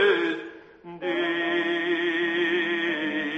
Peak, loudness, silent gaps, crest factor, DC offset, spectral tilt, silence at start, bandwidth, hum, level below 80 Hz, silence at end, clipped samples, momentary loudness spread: -10 dBFS; -25 LUFS; none; 16 dB; under 0.1%; -5 dB/octave; 0 s; 7.8 kHz; none; -72 dBFS; 0 s; under 0.1%; 12 LU